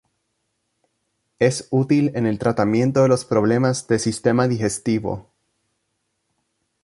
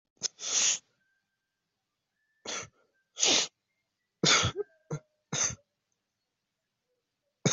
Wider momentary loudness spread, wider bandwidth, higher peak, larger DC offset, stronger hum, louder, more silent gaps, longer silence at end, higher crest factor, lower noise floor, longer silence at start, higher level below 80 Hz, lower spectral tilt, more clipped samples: second, 5 LU vs 18 LU; first, 11.5 kHz vs 8.2 kHz; first, -2 dBFS vs -10 dBFS; neither; neither; first, -20 LUFS vs -28 LUFS; neither; first, 1.65 s vs 0 s; about the same, 20 dB vs 24 dB; second, -73 dBFS vs -85 dBFS; first, 1.4 s vs 0.2 s; first, -54 dBFS vs -66 dBFS; first, -6 dB/octave vs -1.5 dB/octave; neither